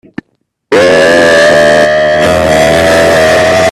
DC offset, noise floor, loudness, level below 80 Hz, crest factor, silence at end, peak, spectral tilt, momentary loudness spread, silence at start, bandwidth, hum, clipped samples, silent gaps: under 0.1%; -60 dBFS; -6 LUFS; -34 dBFS; 6 dB; 0 s; 0 dBFS; -4 dB/octave; 3 LU; 0.7 s; 14.5 kHz; none; 0.3%; none